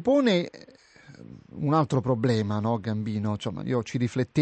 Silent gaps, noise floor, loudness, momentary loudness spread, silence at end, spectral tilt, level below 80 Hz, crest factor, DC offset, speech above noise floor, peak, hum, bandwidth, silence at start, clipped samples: none; -52 dBFS; -26 LUFS; 12 LU; 0 s; -7 dB/octave; -60 dBFS; 16 dB; under 0.1%; 26 dB; -10 dBFS; none; 9 kHz; 0 s; under 0.1%